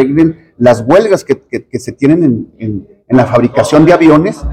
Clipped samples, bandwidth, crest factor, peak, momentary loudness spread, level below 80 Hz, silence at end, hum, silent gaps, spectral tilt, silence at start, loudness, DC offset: 4%; 12 kHz; 10 dB; 0 dBFS; 14 LU; -34 dBFS; 0 s; none; none; -7 dB/octave; 0 s; -9 LUFS; under 0.1%